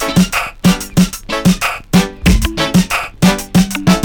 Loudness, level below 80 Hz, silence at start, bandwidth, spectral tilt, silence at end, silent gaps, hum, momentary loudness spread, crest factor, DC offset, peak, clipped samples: -13 LUFS; -24 dBFS; 0 s; over 20 kHz; -5 dB/octave; 0 s; none; none; 3 LU; 10 dB; under 0.1%; -2 dBFS; under 0.1%